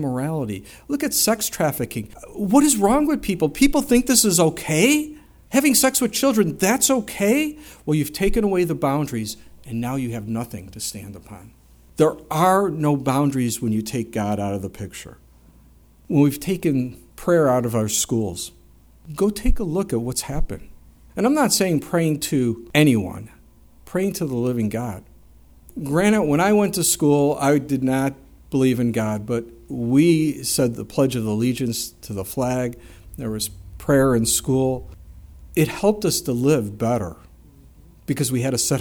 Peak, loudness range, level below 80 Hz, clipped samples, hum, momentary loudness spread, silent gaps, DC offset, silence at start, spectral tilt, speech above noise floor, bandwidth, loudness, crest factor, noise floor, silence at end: -2 dBFS; 7 LU; -38 dBFS; under 0.1%; none; 15 LU; none; under 0.1%; 0 s; -4.5 dB/octave; 31 dB; over 20 kHz; -20 LUFS; 20 dB; -51 dBFS; 0 s